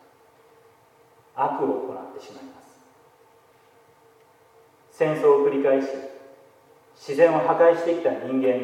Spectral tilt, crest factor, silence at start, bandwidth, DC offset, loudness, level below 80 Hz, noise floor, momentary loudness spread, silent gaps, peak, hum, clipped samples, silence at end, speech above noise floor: -6.5 dB/octave; 20 dB; 1.35 s; 11 kHz; under 0.1%; -22 LUFS; -82 dBFS; -57 dBFS; 23 LU; none; -4 dBFS; none; under 0.1%; 0 s; 35 dB